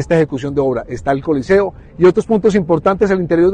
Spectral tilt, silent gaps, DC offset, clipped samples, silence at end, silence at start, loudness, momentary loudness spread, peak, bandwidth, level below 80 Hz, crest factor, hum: -7.5 dB/octave; none; under 0.1%; under 0.1%; 0 s; 0 s; -15 LUFS; 6 LU; -2 dBFS; 9.4 kHz; -40 dBFS; 12 dB; none